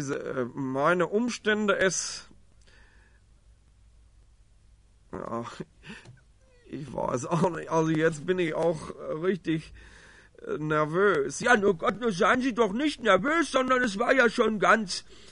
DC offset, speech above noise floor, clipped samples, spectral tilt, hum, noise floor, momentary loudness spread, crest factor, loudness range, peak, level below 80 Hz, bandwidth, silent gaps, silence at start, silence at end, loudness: under 0.1%; 32 dB; under 0.1%; -4.5 dB/octave; none; -59 dBFS; 17 LU; 20 dB; 19 LU; -8 dBFS; -58 dBFS; 11 kHz; none; 0 s; 0.1 s; -26 LUFS